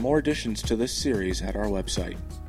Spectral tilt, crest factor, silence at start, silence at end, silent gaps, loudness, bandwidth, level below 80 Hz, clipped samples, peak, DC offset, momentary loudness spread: -4.5 dB/octave; 18 dB; 0 s; 0 s; none; -27 LUFS; 16 kHz; -36 dBFS; under 0.1%; -10 dBFS; under 0.1%; 6 LU